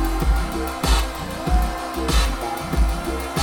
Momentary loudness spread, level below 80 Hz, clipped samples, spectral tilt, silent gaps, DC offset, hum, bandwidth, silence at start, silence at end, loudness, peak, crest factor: 5 LU; -22 dBFS; under 0.1%; -4.5 dB/octave; none; under 0.1%; none; 18 kHz; 0 s; 0 s; -23 LUFS; -6 dBFS; 14 dB